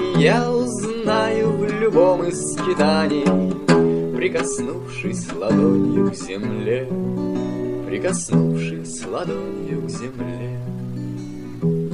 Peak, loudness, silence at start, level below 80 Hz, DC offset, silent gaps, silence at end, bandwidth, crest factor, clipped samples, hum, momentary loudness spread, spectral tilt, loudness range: -2 dBFS; -21 LUFS; 0 s; -48 dBFS; 0.7%; none; 0 s; 11.5 kHz; 18 dB; under 0.1%; none; 12 LU; -6 dB/octave; 6 LU